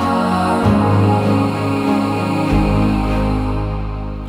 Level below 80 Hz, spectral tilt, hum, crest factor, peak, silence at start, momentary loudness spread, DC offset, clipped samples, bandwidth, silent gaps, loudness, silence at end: -26 dBFS; -7.5 dB/octave; none; 14 dB; -2 dBFS; 0 s; 7 LU; under 0.1%; under 0.1%; 15 kHz; none; -16 LUFS; 0 s